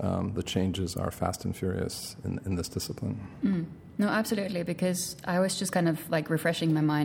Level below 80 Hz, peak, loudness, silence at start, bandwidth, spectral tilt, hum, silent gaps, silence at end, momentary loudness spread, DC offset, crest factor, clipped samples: -58 dBFS; -12 dBFS; -30 LUFS; 0 s; 18 kHz; -5.5 dB/octave; none; none; 0 s; 7 LU; under 0.1%; 18 dB; under 0.1%